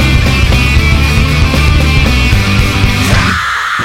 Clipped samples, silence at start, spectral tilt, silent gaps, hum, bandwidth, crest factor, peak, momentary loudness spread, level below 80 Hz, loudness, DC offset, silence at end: under 0.1%; 0 s; -5 dB/octave; none; none; 16.5 kHz; 8 dB; 0 dBFS; 2 LU; -12 dBFS; -9 LUFS; under 0.1%; 0 s